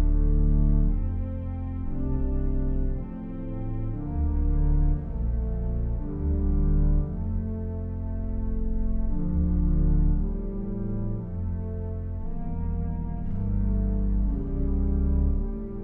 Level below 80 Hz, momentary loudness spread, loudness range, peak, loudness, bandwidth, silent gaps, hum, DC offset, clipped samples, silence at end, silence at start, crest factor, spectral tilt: -26 dBFS; 8 LU; 3 LU; -12 dBFS; -29 LUFS; 2.1 kHz; none; none; under 0.1%; under 0.1%; 0 s; 0 s; 14 dB; -13.5 dB/octave